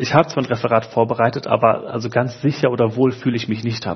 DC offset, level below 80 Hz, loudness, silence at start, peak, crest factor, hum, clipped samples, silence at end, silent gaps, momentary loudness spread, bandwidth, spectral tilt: under 0.1%; -58 dBFS; -19 LUFS; 0 s; 0 dBFS; 18 dB; none; under 0.1%; 0 s; none; 6 LU; 6.4 kHz; -7 dB/octave